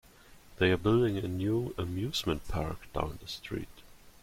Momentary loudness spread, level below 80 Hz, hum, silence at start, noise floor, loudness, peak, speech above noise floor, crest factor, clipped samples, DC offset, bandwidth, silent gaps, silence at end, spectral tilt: 13 LU; -48 dBFS; none; 0.3 s; -56 dBFS; -32 LUFS; -14 dBFS; 24 dB; 20 dB; under 0.1%; under 0.1%; 16.5 kHz; none; 0.15 s; -6 dB/octave